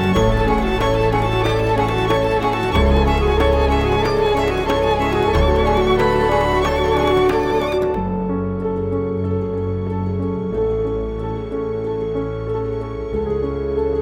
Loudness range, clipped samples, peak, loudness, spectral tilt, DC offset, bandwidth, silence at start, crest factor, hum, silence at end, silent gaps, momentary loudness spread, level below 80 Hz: 6 LU; under 0.1%; -4 dBFS; -19 LUFS; -7 dB/octave; under 0.1%; 16.5 kHz; 0 s; 12 dB; none; 0 s; none; 7 LU; -26 dBFS